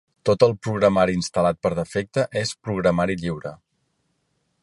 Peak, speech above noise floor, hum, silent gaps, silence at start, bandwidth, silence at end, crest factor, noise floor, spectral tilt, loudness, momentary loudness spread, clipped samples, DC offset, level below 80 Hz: -4 dBFS; 50 dB; none; none; 0.25 s; 11.5 kHz; 1.1 s; 20 dB; -71 dBFS; -6 dB/octave; -22 LUFS; 9 LU; under 0.1%; under 0.1%; -50 dBFS